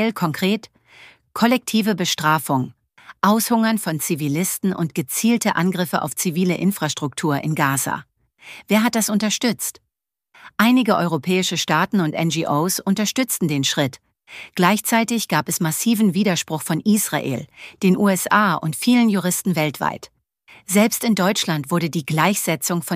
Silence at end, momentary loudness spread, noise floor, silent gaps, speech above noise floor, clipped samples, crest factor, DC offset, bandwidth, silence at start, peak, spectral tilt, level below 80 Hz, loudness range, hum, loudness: 0 s; 8 LU; -80 dBFS; none; 60 dB; under 0.1%; 18 dB; under 0.1%; 15.5 kHz; 0 s; -2 dBFS; -4.5 dB/octave; -64 dBFS; 2 LU; none; -19 LUFS